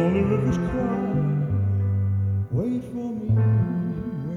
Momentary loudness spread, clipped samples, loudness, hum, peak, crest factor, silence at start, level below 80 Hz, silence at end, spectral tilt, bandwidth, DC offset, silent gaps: 8 LU; under 0.1%; -24 LUFS; none; -10 dBFS; 14 dB; 0 s; -44 dBFS; 0 s; -10 dB/octave; 6.8 kHz; under 0.1%; none